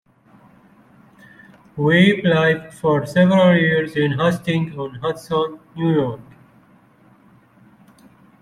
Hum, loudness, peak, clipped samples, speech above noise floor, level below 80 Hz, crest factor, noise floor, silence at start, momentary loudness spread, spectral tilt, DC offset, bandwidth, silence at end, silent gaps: none; -18 LUFS; -2 dBFS; under 0.1%; 35 dB; -56 dBFS; 18 dB; -52 dBFS; 1.75 s; 13 LU; -7 dB/octave; under 0.1%; 12.5 kHz; 2.2 s; none